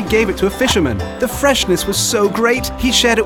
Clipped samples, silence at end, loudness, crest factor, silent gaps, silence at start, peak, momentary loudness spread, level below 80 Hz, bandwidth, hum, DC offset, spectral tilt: under 0.1%; 0 s; -15 LUFS; 14 dB; none; 0 s; 0 dBFS; 4 LU; -30 dBFS; 17.5 kHz; none; 0.2%; -3.5 dB/octave